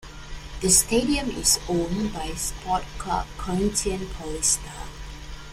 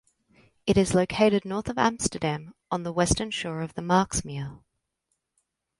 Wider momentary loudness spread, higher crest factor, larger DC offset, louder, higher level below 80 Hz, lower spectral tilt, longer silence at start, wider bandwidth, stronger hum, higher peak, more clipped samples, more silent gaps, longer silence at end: first, 21 LU vs 11 LU; about the same, 22 dB vs 20 dB; neither; about the same, -24 LUFS vs -26 LUFS; first, -38 dBFS vs -46 dBFS; second, -3 dB/octave vs -4.5 dB/octave; second, 0 s vs 0.65 s; first, 16 kHz vs 11.5 kHz; neither; about the same, -4 dBFS vs -6 dBFS; neither; neither; second, 0 s vs 1.25 s